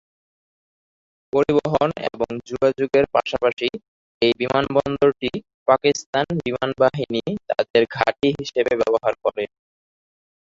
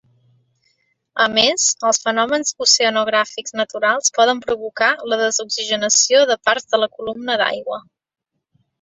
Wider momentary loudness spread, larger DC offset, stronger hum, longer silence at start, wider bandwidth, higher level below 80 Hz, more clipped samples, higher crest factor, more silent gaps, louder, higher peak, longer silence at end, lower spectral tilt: about the same, 8 LU vs 10 LU; neither; neither; first, 1.35 s vs 1.15 s; about the same, 7.8 kHz vs 8.4 kHz; first, -52 dBFS vs -64 dBFS; neither; about the same, 22 dB vs 18 dB; first, 3.53-3.57 s, 3.88-4.21 s, 5.54-5.66 s, 6.06-6.13 s, 7.70-7.74 s vs none; second, -21 LUFS vs -17 LUFS; about the same, 0 dBFS vs 0 dBFS; about the same, 0.95 s vs 1 s; first, -5.5 dB/octave vs 0 dB/octave